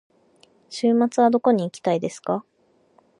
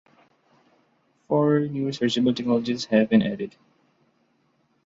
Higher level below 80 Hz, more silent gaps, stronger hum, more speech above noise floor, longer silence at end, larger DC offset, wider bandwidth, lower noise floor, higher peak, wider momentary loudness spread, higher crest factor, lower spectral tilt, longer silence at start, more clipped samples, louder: second, -70 dBFS vs -64 dBFS; neither; neither; second, 40 dB vs 45 dB; second, 0.8 s vs 1.35 s; neither; first, 11 kHz vs 7.6 kHz; second, -60 dBFS vs -67 dBFS; about the same, -6 dBFS vs -6 dBFS; about the same, 10 LU vs 9 LU; about the same, 18 dB vs 18 dB; about the same, -6 dB/octave vs -6.5 dB/octave; second, 0.7 s vs 1.3 s; neither; about the same, -22 LUFS vs -23 LUFS